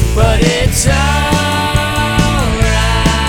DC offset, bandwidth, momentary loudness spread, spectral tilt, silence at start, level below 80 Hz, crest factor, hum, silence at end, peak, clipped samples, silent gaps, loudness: under 0.1%; 19.5 kHz; 2 LU; -4.5 dB/octave; 0 s; -18 dBFS; 10 dB; none; 0 s; 0 dBFS; under 0.1%; none; -12 LUFS